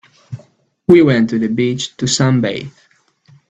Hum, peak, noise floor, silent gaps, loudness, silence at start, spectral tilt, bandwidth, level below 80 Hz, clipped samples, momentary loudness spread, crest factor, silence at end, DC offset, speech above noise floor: none; 0 dBFS; -53 dBFS; none; -14 LUFS; 0.3 s; -5.5 dB/octave; 8.8 kHz; -52 dBFS; under 0.1%; 24 LU; 16 dB; 0.8 s; under 0.1%; 40 dB